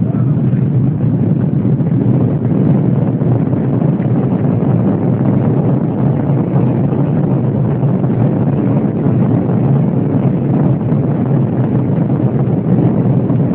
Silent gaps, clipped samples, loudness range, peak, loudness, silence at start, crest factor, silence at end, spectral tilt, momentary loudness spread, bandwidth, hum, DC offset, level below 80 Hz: none; under 0.1%; 0 LU; 0 dBFS; -13 LUFS; 0 s; 12 dB; 0 s; -14 dB/octave; 2 LU; 3.4 kHz; none; under 0.1%; -40 dBFS